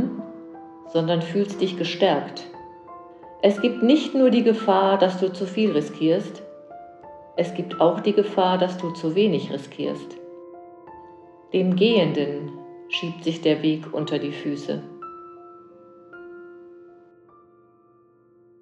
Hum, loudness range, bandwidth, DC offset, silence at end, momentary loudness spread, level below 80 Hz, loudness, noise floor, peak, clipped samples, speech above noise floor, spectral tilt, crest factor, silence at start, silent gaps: none; 7 LU; 8.8 kHz; under 0.1%; 1.8 s; 24 LU; -72 dBFS; -22 LUFS; -57 dBFS; -4 dBFS; under 0.1%; 35 dB; -6.5 dB/octave; 20 dB; 0 s; none